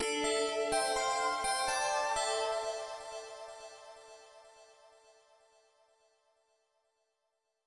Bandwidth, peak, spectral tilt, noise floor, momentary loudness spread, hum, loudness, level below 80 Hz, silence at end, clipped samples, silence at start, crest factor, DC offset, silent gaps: 11.5 kHz; -20 dBFS; -0.5 dB/octave; -83 dBFS; 21 LU; none; -33 LUFS; -66 dBFS; 3 s; under 0.1%; 0 s; 18 dB; under 0.1%; none